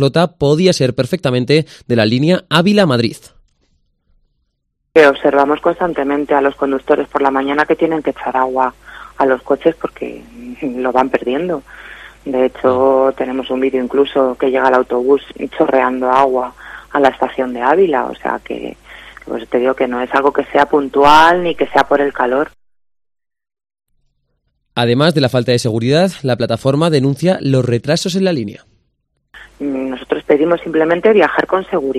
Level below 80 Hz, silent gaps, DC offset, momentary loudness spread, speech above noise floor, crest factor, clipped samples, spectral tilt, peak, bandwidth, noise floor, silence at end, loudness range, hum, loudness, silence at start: -48 dBFS; none; under 0.1%; 12 LU; 55 dB; 14 dB; 0.1%; -6 dB/octave; 0 dBFS; 14 kHz; -69 dBFS; 0 s; 5 LU; none; -14 LUFS; 0 s